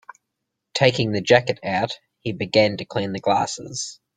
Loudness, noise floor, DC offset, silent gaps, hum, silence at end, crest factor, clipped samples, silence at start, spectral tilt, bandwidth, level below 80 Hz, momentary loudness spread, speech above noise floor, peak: -22 LUFS; -80 dBFS; under 0.1%; none; none; 0.2 s; 22 dB; under 0.1%; 0.75 s; -4.5 dB/octave; 9.6 kHz; -58 dBFS; 12 LU; 59 dB; -2 dBFS